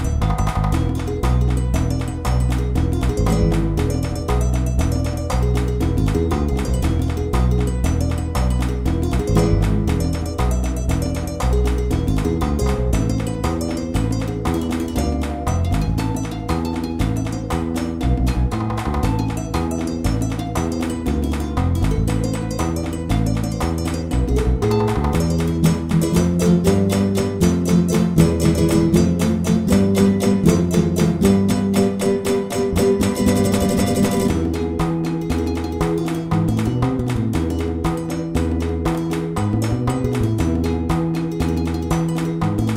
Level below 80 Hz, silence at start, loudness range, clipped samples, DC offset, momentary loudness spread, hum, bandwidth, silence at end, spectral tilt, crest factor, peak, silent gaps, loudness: -26 dBFS; 0 s; 5 LU; under 0.1%; under 0.1%; 6 LU; none; 16 kHz; 0 s; -7 dB/octave; 18 dB; 0 dBFS; none; -20 LUFS